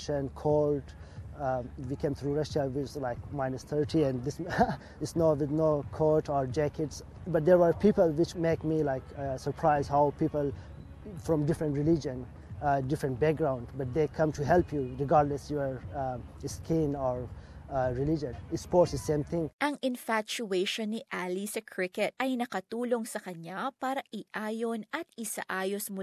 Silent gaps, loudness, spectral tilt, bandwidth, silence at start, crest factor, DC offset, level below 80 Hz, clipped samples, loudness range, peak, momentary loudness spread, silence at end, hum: 19.53-19.59 s; -31 LUFS; -6.5 dB/octave; 14.5 kHz; 0 s; 20 dB; under 0.1%; -50 dBFS; under 0.1%; 6 LU; -10 dBFS; 11 LU; 0 s; none